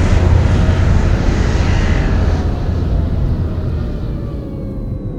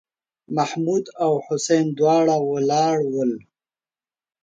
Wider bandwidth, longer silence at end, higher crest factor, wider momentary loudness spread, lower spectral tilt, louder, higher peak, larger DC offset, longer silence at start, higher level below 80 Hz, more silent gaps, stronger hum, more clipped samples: second, 8.2 kHz vs 9.2 kHz; second, 0 s vs 1.05 s; about the same, 14 dB vs 16 dB; first, 11 LU vs 7 LU; first, -7.5 dB/octave vs -5.5 dB/octave; first, -16 LUFS vs -21 LUFS; first, 0 dBFS vs -6 dBFS; neither; second, 0 s vs 0.5 s; first, -18 dBFS vs -70 dBFS; neither; neither; neither